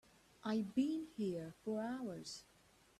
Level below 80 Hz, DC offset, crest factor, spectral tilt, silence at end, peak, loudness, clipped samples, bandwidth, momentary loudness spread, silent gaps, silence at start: -78 dBFS; under 0.1%; 18 dB; -6 dB/octave; 0.55 s; -26 dBFS; -42 LUFS; under 0.1%; 13.5 kHz; 11 LU; none; 0.45 s